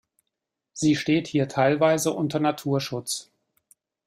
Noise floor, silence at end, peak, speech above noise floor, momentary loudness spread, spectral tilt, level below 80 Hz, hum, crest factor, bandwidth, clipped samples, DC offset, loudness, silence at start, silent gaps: -83 dBFS; 0.85 s; -8 dBFS; 60 dB; 10 LU; -5 dB/octave; -64 dBFS; none; 18 dB; 16 kHz; under 0.1%; under 0.1%; -24 LUFS; 0.75 s; none